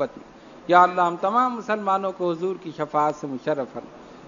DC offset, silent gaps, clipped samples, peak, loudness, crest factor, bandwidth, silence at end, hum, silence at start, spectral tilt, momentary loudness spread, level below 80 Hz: under 0.1%; none; under 0.1%; -2 dBFS; -23 LUFS; 22 dB; 7.4 kHz; 0 s; none; 0 s; -6 dB/octave; 13 LU; -66 dBFS